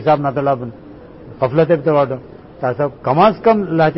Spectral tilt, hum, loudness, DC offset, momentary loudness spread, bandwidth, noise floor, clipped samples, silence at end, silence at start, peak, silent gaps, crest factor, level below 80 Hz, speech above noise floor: -12 dB/octave; none; -16 LUFS; under 0.1%; 10 LU; 5.8 kHz; -36 dBFS; under 0.1%; 0 s; 0 s; -2 dBFS; none; 14 dB; -48 dBFS; 22 dB